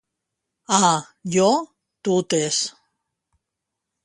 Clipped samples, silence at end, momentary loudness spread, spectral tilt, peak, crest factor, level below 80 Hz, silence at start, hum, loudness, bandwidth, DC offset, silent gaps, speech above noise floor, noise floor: under 0.1%; 1.35 s; 11 LU; -3.5 dB/octave; 0 dBFS; 22 dB; -66 dBFS; 0.7 s; none; -21 LUFS; 11.5 kHz; under 0.1%; none; 63 dB; -82 dBFS